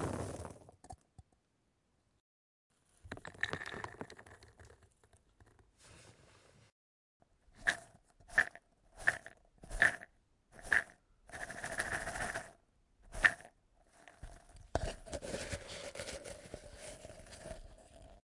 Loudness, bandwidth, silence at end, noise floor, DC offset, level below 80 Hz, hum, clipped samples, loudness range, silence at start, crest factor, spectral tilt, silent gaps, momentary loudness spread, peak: -37 LUFS; 11.5 kHz; 0.05 s; -79 dBFS; under 0.1%; -58 dBFS; none; under 0.1%; 11 LU; 0 s; 32 dB; -3 dB/octave; 2.20-2.70 s, 6.72-7.20 s; 26 LU; -10 dBFS